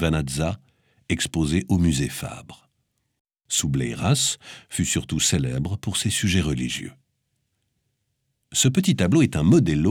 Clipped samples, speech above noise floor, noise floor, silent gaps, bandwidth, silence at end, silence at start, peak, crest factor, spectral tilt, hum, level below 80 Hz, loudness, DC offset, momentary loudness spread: under 0.1%; 53 dB; -75 dBFS; 3.20-3.25 s; 18 kHz; 0 s; 0 s; -8 dBFS; 16 dB; -4.5 dB/octave; none; -42 dBFS; -22 LUFS; under 0.1%; 12 LU